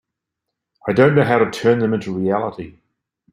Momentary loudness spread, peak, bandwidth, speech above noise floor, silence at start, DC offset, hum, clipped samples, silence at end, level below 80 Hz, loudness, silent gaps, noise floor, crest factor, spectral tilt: 15 LU; -2 dBFS; 12 kHz; 64 dB; 0.85 s; under 0.1%; none; under 0.1%; 0.65 s; -56 dBFS; -17 LUFS; none; -80 dBFS; 18 dB; -7.5 dB/octave